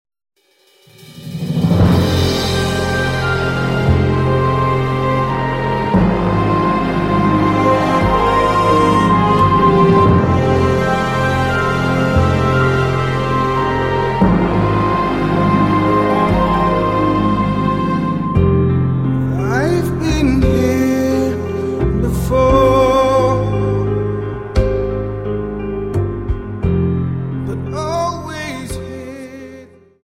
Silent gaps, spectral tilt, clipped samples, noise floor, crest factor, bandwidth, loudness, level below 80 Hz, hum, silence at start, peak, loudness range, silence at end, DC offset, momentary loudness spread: none; -7 dB/octave; under 0.1%; -54 dBFS; 14 dB; 16 kHz; -15 LUFS; -28 dBFS; none; 1.1 s; -2 dBFS; 7 LU; 0.4 s; under 0.1%; 10 LU